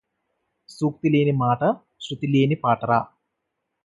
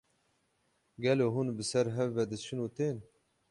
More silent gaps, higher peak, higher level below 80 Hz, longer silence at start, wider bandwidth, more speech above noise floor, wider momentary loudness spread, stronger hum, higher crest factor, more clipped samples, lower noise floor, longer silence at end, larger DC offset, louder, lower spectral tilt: neither; first, -6 dBFS vs -16 dBFS; first, -62 dBFS vs -70 dBFS; second, 0.7 s vs 1 s; about the same, 11.5 kHz vs 11.5 kHz; first, 58 dB vs 43 dB; first, 11 LU vs 8 LU; neither; about the same, 18 dB vs 18 dB; neither; first, -79 dBFS vs -75 dBFS; first, 0.8 s vs 0.5 s; neither; first, -22 LUFS vs -33 LUFS; first, -8 dB/octave vs -6 dB/octave